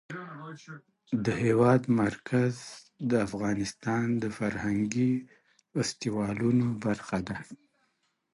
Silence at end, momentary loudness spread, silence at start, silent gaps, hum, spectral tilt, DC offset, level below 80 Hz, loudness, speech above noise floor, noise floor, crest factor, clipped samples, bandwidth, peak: 0.8 s; 18 LU; 0.1 s; none; none; -6.5 dB/octave; under 0.1%; -60 dBFS; -29 LUFS; 46 dB; -75 dBFS; 18 dB; under 0.1%; 11.5 kHz; -12 dBFS